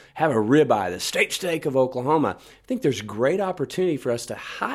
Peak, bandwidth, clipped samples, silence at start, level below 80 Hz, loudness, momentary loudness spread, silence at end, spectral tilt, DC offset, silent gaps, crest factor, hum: -6 dBFS; 15 kHz; under 0.1%; 0.15 s; -60 dBFS; -23 LUFS; 10 LU; 0 s; -5 dB/octave; under 0.1%; none; 18 dB; none